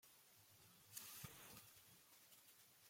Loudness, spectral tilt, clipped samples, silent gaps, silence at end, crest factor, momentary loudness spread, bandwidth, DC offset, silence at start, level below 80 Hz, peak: -61 LUFS; -2 dB/octave; under 0.1%; none; 0 s; 26 dB; 12 LU; 16.5 kHz; under 0.1%; 0 s; -86 dBFS; -36 dBFS